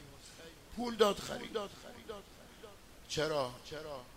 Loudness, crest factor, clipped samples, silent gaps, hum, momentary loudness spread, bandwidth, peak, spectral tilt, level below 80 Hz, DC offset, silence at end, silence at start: -37 LUFS; 26 dB; under 0.1%; none; none; 23 LU; 16 kHz; -14 dBFS; -4 dB/octave; -62 dBFS; under 0.1%; 0 s; 0 s